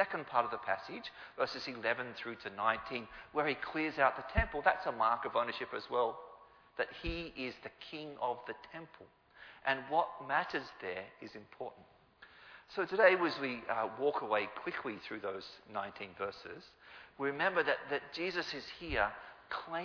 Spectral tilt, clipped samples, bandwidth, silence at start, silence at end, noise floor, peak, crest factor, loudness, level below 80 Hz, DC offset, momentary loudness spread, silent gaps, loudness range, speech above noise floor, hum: -2 dB/octave; under 0.1%; 5.4 kHz; 0 s; 0 s; -61 dBFS; -14 dBFS; 22 dB; -36 LUFS; -56 dBFS; under 0.1%; 17 LU; none; 6 LU; 24 dB; none